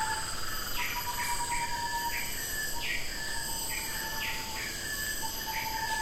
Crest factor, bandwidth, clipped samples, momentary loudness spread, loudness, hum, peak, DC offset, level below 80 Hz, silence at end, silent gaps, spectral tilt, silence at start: 14 dB; 16 kHz; under 0.1%; 2 LU; -33 LUFS; none; -20 dBFS; under 0.1%; -44 dBFS; 0 s; none; -1 dB/octave; 0 s